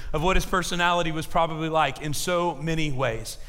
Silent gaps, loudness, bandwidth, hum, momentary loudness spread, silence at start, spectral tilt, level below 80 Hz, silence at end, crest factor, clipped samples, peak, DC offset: none; -25 LUFS; 16 kHz; none; 5 LU; 0 s; -4.5 dB/octave; -34 dBFS; 0 s; 18 dB; under 0.1%; -8 dBFS; under 0.1%